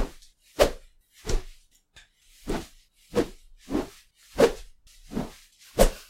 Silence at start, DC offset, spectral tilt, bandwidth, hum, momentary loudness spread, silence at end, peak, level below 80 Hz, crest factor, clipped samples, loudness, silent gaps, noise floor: 0 s; under 0.1%; -4.5 dB/octave; 16 kHz; none; 20 LU; 0.05 s; -4 dBFS; -34 dBFS; 24 dB; under 0.1%; -28 LUFS; none; -57 dBFS